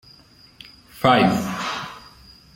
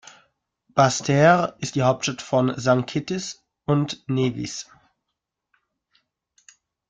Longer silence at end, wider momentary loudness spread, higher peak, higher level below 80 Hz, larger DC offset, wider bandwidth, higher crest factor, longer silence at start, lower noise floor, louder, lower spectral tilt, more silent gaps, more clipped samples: second, 0.55 s vs 2.25 s; first, 24 LU vs 15 LU; about the same, -2 dBFS vs -4 dBFS; first, -54 dBFS vs -60 dBFS; neither; first, 16.5 kHz vs 9.4 kHz; about the same, 22 dB vs 20 dB; first, 0.95 s vs 0.75 s; second, -50 dBFS vs -82 dBFS; about the same, -20 LUFS vs -22 LUFS; about the same, -5.5 dB/octave vs -5.5 dB/octave; neither; neither